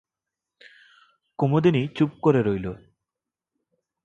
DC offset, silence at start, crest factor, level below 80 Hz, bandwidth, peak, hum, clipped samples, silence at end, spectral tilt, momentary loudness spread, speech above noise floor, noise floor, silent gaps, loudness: under 0.1%; 1.4 s; 20 dB; -56 dBFS; 7.8 kHz; -6 dBFS; none; under 0.1%; 1.3 s; -9 dB/octave; 17 LU; 66 dB; -88 dBFS; none; -23 LUFS